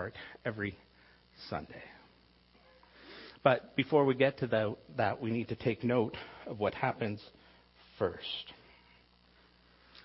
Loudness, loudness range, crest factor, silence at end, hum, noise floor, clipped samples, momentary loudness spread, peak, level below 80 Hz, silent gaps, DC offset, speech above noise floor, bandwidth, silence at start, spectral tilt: -34 LUFS; 9 LU; 26 dB; 0.05 s; 60 Hz at -65 dBFS; -64 dBFS; under 0.1%; 21 LU; -10 dBFS; -66 dBFS; none; under 0.1%; 31 dB; 5.8 kHz; 0 s; -9.5 dB/octave